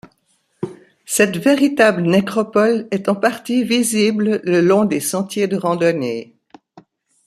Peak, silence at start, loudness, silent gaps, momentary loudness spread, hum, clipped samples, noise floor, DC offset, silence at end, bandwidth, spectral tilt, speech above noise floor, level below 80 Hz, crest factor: -2 dBFS; 0.6 s; -16 LUFS; none; 10 LU; none; under 0.1%; -63 dBFS; under 0.1%; 1.05 s; 15 kHz; -4.5 dB/octave; 47 dB; -62 dBFS; 16 dB